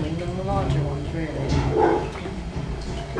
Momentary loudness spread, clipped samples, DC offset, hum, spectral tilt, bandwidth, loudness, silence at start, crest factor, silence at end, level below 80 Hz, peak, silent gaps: 11 LU; under 0.1%; under 0.1%; none; -7 dB/octave; 10.5 kHz; -25 LUFS; 0 s; 18 dB; 0 s; -34 dBFS; -6 dBFS; none